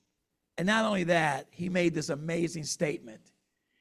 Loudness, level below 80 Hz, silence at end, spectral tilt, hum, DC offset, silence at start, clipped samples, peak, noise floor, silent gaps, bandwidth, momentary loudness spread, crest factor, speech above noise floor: -30 LUFS; -66 dBFS; 0.65 s; -4.5 dB/octave; none; under 0.1%; 0.55 s; under 0.1%; -14 dBFS; -82 dBFS; none; 13.5 kHz; 8 LU; 18 dB; 52 dB